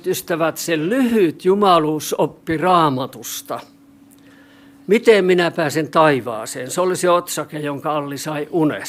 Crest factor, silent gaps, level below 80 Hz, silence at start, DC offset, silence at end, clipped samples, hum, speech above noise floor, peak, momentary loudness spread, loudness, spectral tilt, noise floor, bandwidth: 18 dB; none; -60 dBFS; 0.05 s; under 0.1%; 0 s; under 0.1%; none; 30 dB; 0 dBFS; 13 LU; -18 LUFS; -5 dB/octave; -47 dBFS; 16 kHz